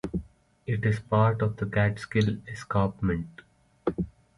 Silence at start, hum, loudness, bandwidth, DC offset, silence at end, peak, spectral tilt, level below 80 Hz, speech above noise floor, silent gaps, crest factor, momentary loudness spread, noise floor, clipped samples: 0.05 s; none; -28 LUFS; 11 kHz; under 0.1%; 0.3 s; -10 dBFS; -8 dB/octave; -48 dBFS; 20 dB; none; 18 dB; 12 LU; -47 dBFS; under 0.1%